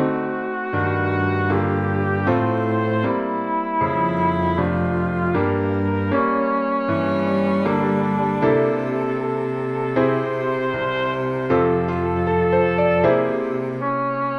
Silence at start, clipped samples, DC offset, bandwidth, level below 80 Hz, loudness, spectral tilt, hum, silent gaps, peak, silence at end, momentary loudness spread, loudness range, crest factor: 0 s; under 0.1%; under 0.1%; 6.6 kHz; -48 dBFS; -21 LUFS; -9 dB/octave; none; none; -4 dBFS; 0 s; 5 LU; 1 LU; 16 dB